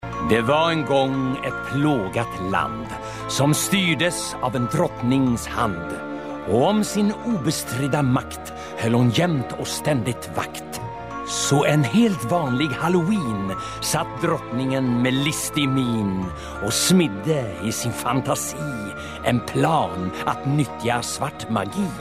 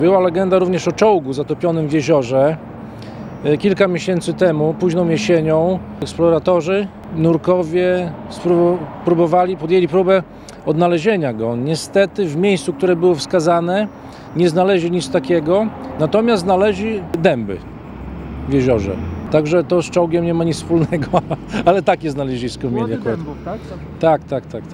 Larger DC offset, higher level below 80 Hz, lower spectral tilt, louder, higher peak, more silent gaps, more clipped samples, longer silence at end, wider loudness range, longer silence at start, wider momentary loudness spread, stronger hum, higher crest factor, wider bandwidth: first, 0.2% vs under 0.1%; about the same, -46 dBFS vs -42 dBFS; second, -5 dB/octave vs -6.5 dB/octave; second, -22 LUFS vs -17 LUFS; second, -6 dBFS vs 0 dBFS; neither; neither; about the same, 0 s vs 0 s; about the same, 2 LU vs 2 LU; about the same, 0 s vs 0 s; about the same, 10 LU vs 12 LU; neither; about the same, 16 dB vs 16 dB; first, 16 kHz vs 12 kHz